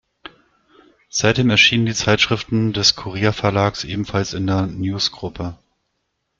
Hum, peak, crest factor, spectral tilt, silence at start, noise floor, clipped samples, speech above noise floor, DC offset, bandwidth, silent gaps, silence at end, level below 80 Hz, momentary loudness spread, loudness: none; 0 dBFS; 20 dB; -4 dB/octave; 0.25 s; -73 dBFS; under 0.1%; 54 dB; under 0.1%; 7.6 kHz; none; 0.85 s; -46 dBFS; 12 LU; -18 LUFS